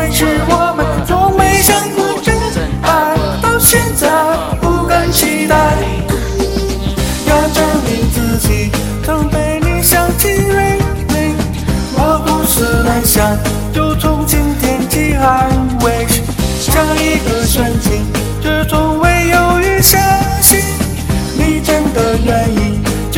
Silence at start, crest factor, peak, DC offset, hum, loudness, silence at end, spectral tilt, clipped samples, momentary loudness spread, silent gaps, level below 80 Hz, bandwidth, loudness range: 0 s; 12 dB; 0 dBFS; under 0.1%; none; -12 LUFS; 0 s; -4.5 dB/octave; under 0.1%; 8 LU; none; -20 dBFS; 17 kHz; 3 LU